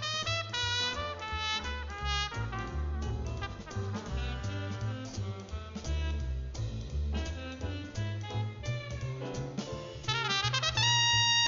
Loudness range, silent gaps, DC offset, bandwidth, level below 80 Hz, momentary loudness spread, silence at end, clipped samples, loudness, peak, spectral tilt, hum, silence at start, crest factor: 6 LU; none; under 0.1%; 7.6 kHz; -40 dBFS; 11 LU; 0 s; under 0.1%; -33 LUFS; -14 dBFS; -3 dB/octave; none; 0 s; 18 dB